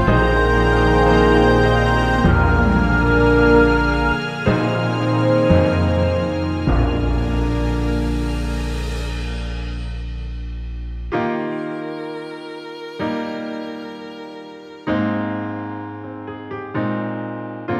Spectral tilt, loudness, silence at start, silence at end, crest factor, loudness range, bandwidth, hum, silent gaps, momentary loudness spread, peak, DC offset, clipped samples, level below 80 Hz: -7.5 dB/octave; -18 LUFS; 0 s; 0 s; 16 dB; 12 LU; 10 kHz; none; none; 17 LU; -2 dBFS; under 0.1%; under 0.1%; -26 dBFS